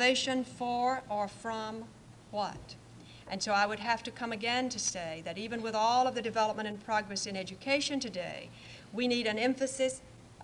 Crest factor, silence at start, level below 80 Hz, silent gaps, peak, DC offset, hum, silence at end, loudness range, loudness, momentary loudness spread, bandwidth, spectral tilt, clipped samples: 18 dB; 0 s; -66 dBFS; none; -16 dBFS; under 0.1%; none; 0 s; 4 LU; -33 LUFS; 15 LU; 11.5 kHz; -2.5 dB/octave; under 0.1%